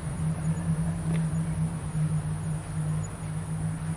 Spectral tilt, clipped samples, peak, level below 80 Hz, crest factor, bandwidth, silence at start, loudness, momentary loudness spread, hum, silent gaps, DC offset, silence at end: -7 dB/octave; under 0.1%; -18 dBFS; -44 dBFS; 12 dB; 11.5 kHz; 0 s; -30 LUFS; 4 LU; none; none; under 0.1%; 0 s